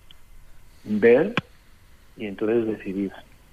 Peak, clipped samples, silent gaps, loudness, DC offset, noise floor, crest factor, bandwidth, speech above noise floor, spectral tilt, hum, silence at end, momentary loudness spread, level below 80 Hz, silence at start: -6 dBFS; under 0.1%; none; -23 LUFS; under 0.1%; -50 dBFS; 20 dB; 8.4 kHz; 28 dB; -7.5 dB/octave; none; 0.3 s; 18 LU; -52 dBFS; 0.1 s